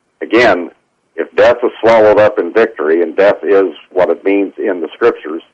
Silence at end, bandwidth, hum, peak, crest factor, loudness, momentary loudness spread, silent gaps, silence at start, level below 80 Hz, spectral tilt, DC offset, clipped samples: 0.15 s; 8.2 kHz; none; -2 dBFS; 10 dB; -12 LUFS; 10 LU; none; 0.2 s; -50 dBFS; -6 dB/octave; under 0.1%; under 0.1%